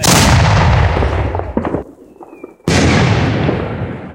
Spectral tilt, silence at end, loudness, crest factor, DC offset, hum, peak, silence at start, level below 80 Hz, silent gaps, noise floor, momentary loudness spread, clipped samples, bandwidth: -5 dB/octave; 0 s; -13 LUFS; 14 dB; under 0.1%; none; 0 dBFS; 0 s; -24 dBFS; none; -37 dBFS; 12 LU; under 0.1%; 17.5 kHz